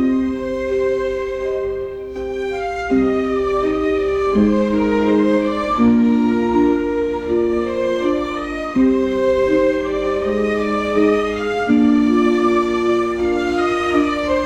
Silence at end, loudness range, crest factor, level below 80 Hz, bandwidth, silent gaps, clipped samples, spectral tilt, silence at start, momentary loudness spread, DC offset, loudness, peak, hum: 0 s; 4 LU; 12 dB; -40 dBFS; 9.8 kHz; none; under 0.1%; -6.5 dB/octave; 0 s; 8 LU; under 0.1%; -17 LUFS; -4 dBFS; none